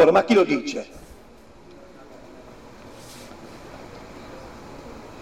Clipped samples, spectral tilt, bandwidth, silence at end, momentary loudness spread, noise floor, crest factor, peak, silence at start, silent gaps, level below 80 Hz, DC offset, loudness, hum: under 0.1%; -5.5 dB/octave; 15 kHz; 0.1 s; 27 LU; -48 dBFS; 18 dB; -6 dBFS; 0 s; none; -52 dBFS; 0.2%; -20 LUFS; none